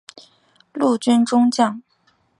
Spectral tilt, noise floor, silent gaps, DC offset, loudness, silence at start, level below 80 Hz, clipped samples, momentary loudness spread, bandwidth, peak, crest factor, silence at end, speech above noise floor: -4.5 dB/octave; -62 dBFS; none; under 0.1%; -18 LUFS; 0.75 s; -72 dBFS; under 0.1%; 16 LU; 11.5 kHz; -2 dBFS; 18 dB; 0.6 s; 45 dB